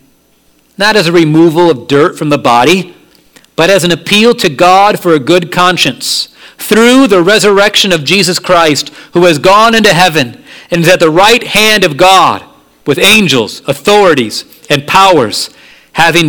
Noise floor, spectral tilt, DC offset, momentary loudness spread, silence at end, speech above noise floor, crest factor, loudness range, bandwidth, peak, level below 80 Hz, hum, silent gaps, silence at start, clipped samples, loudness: -49 dBFS; -4 dB/octave; 0.9%; 10 LU; 0 s; 42 dB; 8 dB; 2 LU; over 20 kHz; 0 dBFS; -42 dBFS; none; none; 0.8 s; 4%; -7 LUFS